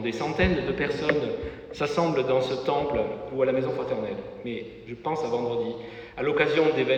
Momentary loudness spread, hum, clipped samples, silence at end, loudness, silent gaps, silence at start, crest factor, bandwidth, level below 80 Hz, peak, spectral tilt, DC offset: 12 LU; none; under 0.1%; 0 s; -27 LUFS; none; 0 s; 20 dB; 8.8 kHz; -46 dBFS; -6 dBFS; -6.5 dB/octave; under 0.1%